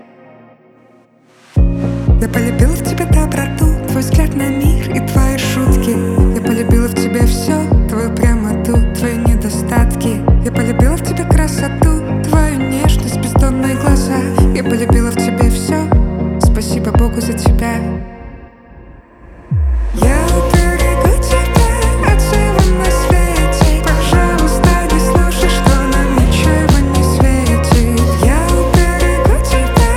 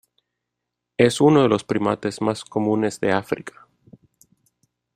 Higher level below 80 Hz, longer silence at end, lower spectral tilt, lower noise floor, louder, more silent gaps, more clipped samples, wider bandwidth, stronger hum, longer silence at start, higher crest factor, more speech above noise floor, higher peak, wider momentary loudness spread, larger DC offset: first, -16 dBFS vs -60 dBFS; second, 0 s vs 1.45 s; about the same, -6 dB/octave vs -6 dB/octave; second, -47 dBFS vs -82 dBFS; first, -13 LUFS vs -20 LUFS; neither; neither; about the same, 16 kHz vs 15 kHz; second, none vs 60 Hz at -50 dBFS; first, 1.55 s vs 1 s; second, 12 dB vs 20 dB; second, 35 dB vs 62 dB; about the same, 0 dBFS vs -2 dBFS; second, 4 LU vs 14 LU; neither